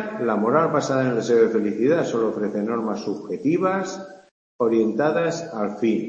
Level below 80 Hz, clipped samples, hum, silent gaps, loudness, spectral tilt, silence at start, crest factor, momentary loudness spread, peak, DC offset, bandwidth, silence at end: -68 dBFS; under 0.1%; none; 4.31-4.59 s; -22 LUFS; -6.5 dB/octave; 0 s; 18 dB; 9 LU; -4 dBFS; under 0.1%; 8 kHz; 0 s